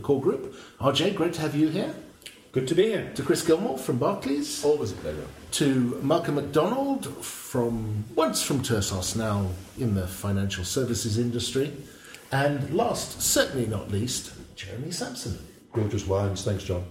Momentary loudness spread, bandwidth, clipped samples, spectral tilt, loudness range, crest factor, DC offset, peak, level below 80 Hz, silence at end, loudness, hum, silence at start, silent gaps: 11 LU; 16.5 kHz; under 0.1%; -4.5 dB/octave; 2 LU; 18 dB; under 0.1%; -8 dBFS; -52 dBFS; 0 s; -27 LUFS; none; 0 s; none